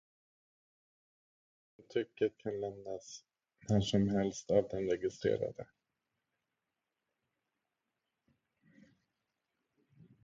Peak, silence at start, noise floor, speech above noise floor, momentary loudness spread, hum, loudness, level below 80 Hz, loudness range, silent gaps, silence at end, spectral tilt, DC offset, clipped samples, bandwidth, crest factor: -16 dBFS; 1.9 s; -89 dBFS; 54 dB; 20 LU; none; -36 LUFS; -64 dBFS; 7 LU; none; 4.6 s; -6.5 dB/octave; under 0.1%; under 0.1%; 7.6 kHz; 24 dB